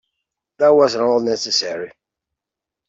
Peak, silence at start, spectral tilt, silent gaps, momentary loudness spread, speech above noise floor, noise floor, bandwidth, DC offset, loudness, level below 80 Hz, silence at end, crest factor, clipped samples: -4 dBFS; 0.6 s; -3 dB/octave; none; 15 LU; 69 dB; -85 dBFS; 7.8 kHz; under 0.1%; -16 LUFS; -64 dBFS; 1 s; 16 dB; under 0.1%